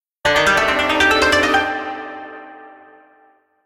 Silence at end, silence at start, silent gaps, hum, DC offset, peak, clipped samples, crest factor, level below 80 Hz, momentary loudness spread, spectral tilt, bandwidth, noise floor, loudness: 0.9 s; 0.25 s; none; none; under 0.1%; -2 dBFS; under 0.1%; 16 dB; -42 dBFS; 20 LU; -2.5 dB/octave; 17 kHz; -55 dBFS; -15 LUFS